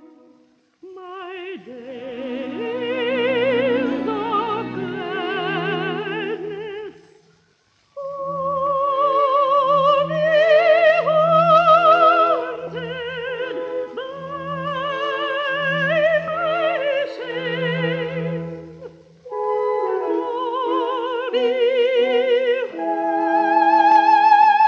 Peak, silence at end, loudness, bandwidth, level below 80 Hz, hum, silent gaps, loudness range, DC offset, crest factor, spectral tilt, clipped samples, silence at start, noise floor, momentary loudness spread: -4 dBFS; 0 s; -19 LUFS; 7 kHz; -62 dBFS; none; none; 11 LU; under 0.1%; 16 dB; -6.5 dB/octave; under 0.1%; 0.85 s; -61 dBFS; 17 LU